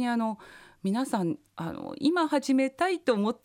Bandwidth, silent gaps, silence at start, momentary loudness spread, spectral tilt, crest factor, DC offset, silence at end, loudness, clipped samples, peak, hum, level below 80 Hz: 15.5 kHz; none; 0 s; 11 LU; -5.5 dB/octave; 16 dB; under 0.1%; 0.1 s; -28 LUFS; under 0.1%; -12 dBFS; none; -68 dBFS